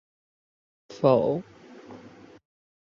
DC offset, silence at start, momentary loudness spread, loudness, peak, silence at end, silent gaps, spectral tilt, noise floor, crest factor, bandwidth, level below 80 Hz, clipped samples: under 0.1%; 0.9 s; 25 LU; -24 LUFS; -8 dBFS; 0.8 s; none; -8.5 dB/octave; -49 dBFS; 22 dB; 7.2 kHz; -68 dBFS; under 0.1%